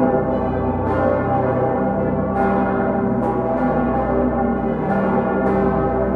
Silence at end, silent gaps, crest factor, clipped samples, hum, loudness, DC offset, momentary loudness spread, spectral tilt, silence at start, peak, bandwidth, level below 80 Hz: 0 s; none; 14 dB; under 0.1%; none; -19 LUFS; under 0.1%; 2 LU; -10.5 dB/octave; 0 s; -4 dBFS; 4.7 kHz; -34 dBFS